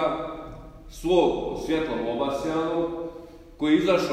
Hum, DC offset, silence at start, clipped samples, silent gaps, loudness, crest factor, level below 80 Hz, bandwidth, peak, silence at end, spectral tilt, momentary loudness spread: none; under 0.1%; 0 s; under 0.1%; none; -25 LUFS; 18 dB; -46 dBFS; 15 kHz; -8 dBFS; 0 s; -6 dB/octave; 19 LU